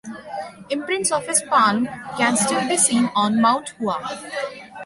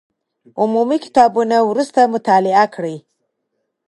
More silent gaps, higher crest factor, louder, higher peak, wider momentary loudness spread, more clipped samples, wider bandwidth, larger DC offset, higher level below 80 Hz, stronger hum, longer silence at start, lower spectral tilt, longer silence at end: neither; about the same, 18 dB vs 16 dB; second, -20 LUFS vs -15 LUFS; second, -4 dBFS vs 0 dBFS; about the same, 14 LU vs 13 LU; neither; about the same, 11.5 kHz vs 11.5 kHz; neither; about the same, -62 dBFS vs -66 dBFS; neither; second, 0.05 s vs 0.55 s; second, -2.5 dB/octave vs -5.5 dB/octave; second, 0 s vs 0.9 s